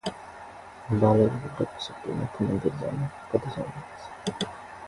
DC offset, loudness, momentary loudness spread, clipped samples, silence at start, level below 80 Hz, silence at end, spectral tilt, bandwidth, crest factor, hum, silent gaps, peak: under 0.1%; -28 LUFS; 20 LU; under 0.1%; 0.05 s; -54 dBFS; 0 s; -7 dB/octave; 11.5 kHz; 22 dB; none; none; -6 dBFS